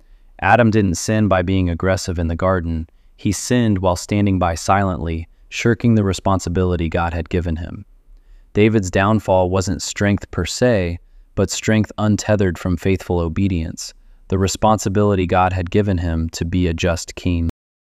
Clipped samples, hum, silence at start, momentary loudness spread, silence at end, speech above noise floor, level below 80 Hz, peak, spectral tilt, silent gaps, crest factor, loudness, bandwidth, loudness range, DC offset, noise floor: under 0.1%; none; 0.4 s; 10 LU; 0.4 s; 27 dB; -34 dBFS; -2 dBFS; -6 dB/octave; none; 16 dB; -18 LUFS; 14.5 kHz; 2 LU; under 0.1%; -45 dBFS